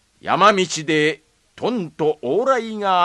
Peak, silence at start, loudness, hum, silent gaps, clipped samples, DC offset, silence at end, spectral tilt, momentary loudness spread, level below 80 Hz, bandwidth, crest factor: 0 dBFS; 0.25 s; -19 LUFS; none; none; under 0.1%; under 0.1%; 0 s; -4 dB/octave; 9 LU; -62 dBFS; 11.5 kHz; 18 dB